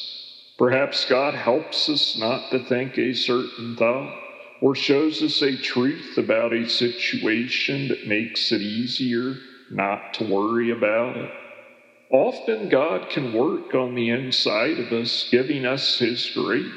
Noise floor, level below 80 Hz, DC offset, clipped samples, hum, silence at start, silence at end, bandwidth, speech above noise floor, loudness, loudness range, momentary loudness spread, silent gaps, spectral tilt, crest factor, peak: -50 dBFS; -84 dBFS; under 0.1%; under 0.1%; none; 0 s; 0 s; 10 kHz; 27 dB; -22 LUFS; 2 LU; 7 LU; none; -5 dB/octave; 20 dB; -2 dBFS